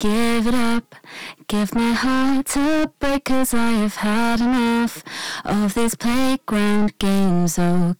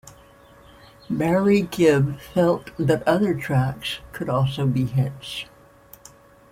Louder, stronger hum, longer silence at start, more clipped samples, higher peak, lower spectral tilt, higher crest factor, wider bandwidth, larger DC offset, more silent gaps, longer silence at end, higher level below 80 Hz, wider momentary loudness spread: about the same, -20 LUFS vs -22 LUFS; neither; about the same, 0 s vs 0.05 s; neither; about the same, -8 dBFS vs -6 dBFS; second, -5 dB/octave vs -7 dB/octave; second, 10 dB vs 18 dB; first, 19.5 kHz vs 16 kHz; neither; neither; second, 0 s vs 1.05 s; first, -38 dBFS vs -50 dBFS; second, 7 LU vs 12 LU